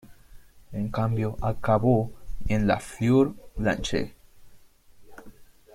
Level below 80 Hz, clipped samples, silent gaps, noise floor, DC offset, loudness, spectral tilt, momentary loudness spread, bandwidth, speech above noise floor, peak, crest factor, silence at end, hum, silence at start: -42 dBFS; under 0.1%; none; -52 dBFS; under 0.1%; -26 LUFS; -7 dB/octave; 13 LU; 15.5 kHz; 28 dB; -10 dBFS; 18 dB; 0.3 s; none; 0.05 s